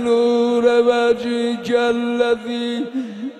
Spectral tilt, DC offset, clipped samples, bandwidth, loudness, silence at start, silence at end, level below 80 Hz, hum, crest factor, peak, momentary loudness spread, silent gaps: -4.5 dB/octave; under 0.1%; under 0.1%; 10.5 kHz; -18 LUFS; 0 s; 0 s; -58 dBFS; none; 14 dB; -4 dBFS; 9 LU; none